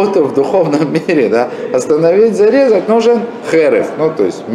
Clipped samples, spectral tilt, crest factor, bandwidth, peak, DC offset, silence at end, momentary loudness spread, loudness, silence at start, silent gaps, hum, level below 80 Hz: under 0.1%; -6 dB/octave; 10 dB; 11.5 kHz; 0 dBFS; under 0.1%; 0 s; 6 LU; -11 LUFS; 0 s; none; none; -58 dBFS